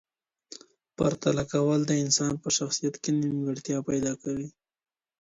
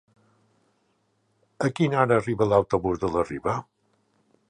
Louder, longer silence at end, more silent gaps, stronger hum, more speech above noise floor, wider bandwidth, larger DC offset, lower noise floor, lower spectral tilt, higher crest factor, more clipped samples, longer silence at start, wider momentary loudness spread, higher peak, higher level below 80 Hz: second, -27 LUFS vs -24 LUFS; second, 0.7 s vs 0.9 s; neither; neither; second, 25 dB vs 47 dB; second, 8 kHz vs 10.5 kHz; neither; second, -52 dBFS vs -70 dBFS; second, -4.5 dB/octave vs -7 dB/octave; about the same, 18 dB vs 22 dB; neither; second, 0.5 s vs 1.6 s; first, 17 LU vs 8 LU; second, -10 dBFS vs -6 dBFS; second, -60 dBFS vs -52 dBFS